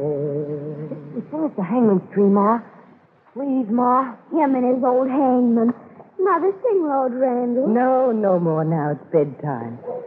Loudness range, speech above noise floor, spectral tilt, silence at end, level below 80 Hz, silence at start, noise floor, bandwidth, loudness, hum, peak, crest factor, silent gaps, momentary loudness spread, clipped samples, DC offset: 2 LU; 33 dB; -12.5 dB/octave; 0 s; -74 dBFS; 0 s; -52 dBFS; 3.4 kHz; -20 LUFS; none; -6 dBFS; 14 dB; none; 12 LU; under 0.1%; under 0.1%